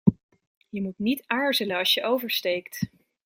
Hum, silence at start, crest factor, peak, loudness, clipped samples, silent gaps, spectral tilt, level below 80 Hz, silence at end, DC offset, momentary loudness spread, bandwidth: none; 0.05 s; 24 dB; -4 dBFS; -26 LUFS; under 0.1%; 0.23-0.29 s, 0.47-0.61 s; -5 dB/octave; -58 dBFS; 0.4 s; under 0.1%; 12 LU; 16.5 kHz